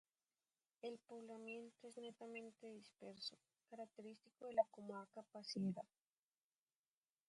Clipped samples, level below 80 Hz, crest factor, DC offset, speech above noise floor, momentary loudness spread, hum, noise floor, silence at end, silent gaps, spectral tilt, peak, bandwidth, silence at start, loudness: under 0.1%; under -90 dBFS; 26 dB; under 0.1%; over 39 dB; 16 LU; none; under -90 dBFS; 1.45 s; none; -5.5 dB/octave; -26 dBFS; 11 kHz; 0.85 s; -51 LUFS